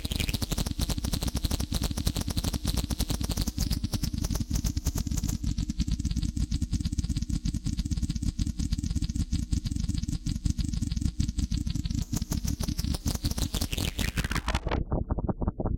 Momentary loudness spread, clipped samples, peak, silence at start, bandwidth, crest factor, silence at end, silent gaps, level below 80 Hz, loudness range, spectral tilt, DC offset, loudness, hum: 2 LU; under 0.1%; -14 dBFS; 0 s; 17 kHz; 16 dB; 0 s; none; -32 dBFS; 1 LU; -5 dB/octave; under 0.1%; -31 LUFS; none